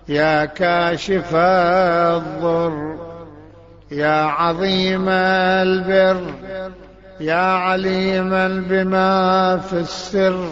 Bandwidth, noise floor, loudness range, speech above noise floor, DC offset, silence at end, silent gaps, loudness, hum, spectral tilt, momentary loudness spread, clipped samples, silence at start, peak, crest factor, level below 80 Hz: 7.8 kHz; -43 dBFS; 2 LU; 26 dB; 0.1%; 0 s; none; -17 LUFS; none; -6 dB/octave; 13 LU; under 0.1%; 0.05 s; -4 dBFS; 14 dB; -46 dBFS